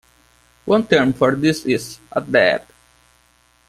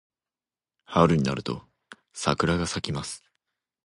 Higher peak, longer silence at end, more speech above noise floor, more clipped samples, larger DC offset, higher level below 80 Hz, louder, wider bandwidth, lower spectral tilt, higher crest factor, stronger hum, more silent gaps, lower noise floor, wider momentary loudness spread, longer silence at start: first, 0 dBFS vs -4 dBFS; first, 1.05 s vs 0.7 s; second, 40 dB vs over 65 dB; neither; neither; second, -54 dBFS vs -48 dBFS; first, -18 LUFS vs -26 LUFS; first, 15 kHz vs 11.5 kHz; about the same, -5.5 dB/octave vs -5.5 dB/octave; second, 18 dB vs 24 dB; neither; neither; second, -57 dBFS vs under -90 dBFS; second, 11 LU vs 16 LU; second, 0.65 s vs 0.9 s